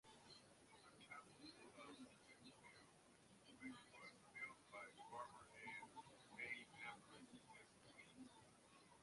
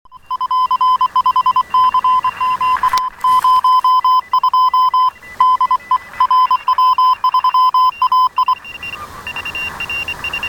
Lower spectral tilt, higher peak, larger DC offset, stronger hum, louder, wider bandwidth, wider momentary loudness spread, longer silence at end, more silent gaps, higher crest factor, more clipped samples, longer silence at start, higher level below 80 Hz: first, -3 dB/octave vs -1.5 dB/octave; second, -40 dBFS vs -2 dBFS; neither; neither; second, -60 LUFS vs -14 LUFS; second, 11.5 kHz vs 17.5 kHz; first, 13 LU vs 10 LU; about the same, 0 s vs 0 s; neither; first, 22 dB vs 12 dB; neither; about the same, 0.05 s vs 0.15 s; second, -88 dBFS vs -48 dBFS